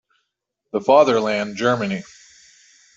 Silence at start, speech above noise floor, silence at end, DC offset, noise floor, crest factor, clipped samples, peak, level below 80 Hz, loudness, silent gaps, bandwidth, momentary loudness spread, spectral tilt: 0.75 s; 60 dB; 0.95 s; under 0.1%; -78 dBFS; 18 dB; under 0.1%; -2 dBFS; -64 dBFS; -19 LUFS; none; 7.8 kHz; 13 LU; -5.5 dB/octave